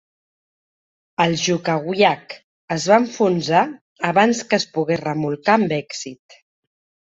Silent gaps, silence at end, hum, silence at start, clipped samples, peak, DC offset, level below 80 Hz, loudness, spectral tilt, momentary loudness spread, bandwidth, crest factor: 2.44-2.68 s, 3.81-3.96 s; 0.95 s; none; 1.2 s; under 0.1%; -2 dBFS; under 0.1%; -62 dBFS; -19 LUFS; -4.5 dB/octave; 14 LU; 8 kHz; 18 dB